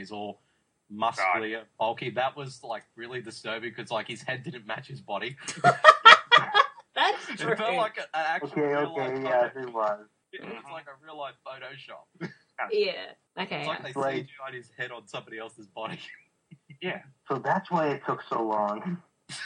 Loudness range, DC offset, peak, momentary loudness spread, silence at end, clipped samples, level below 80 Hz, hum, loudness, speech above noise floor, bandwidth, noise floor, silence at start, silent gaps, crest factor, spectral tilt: 15 LU; under 0.1%; 0 dBFS; 18 LU; 0 s; under 0.1%; -76 dBFS; none; -25 LUFS; 25 dB; 10.5 kHz; -54 dBFS; 0 s; none; 28 dB; -3.5 dB/octave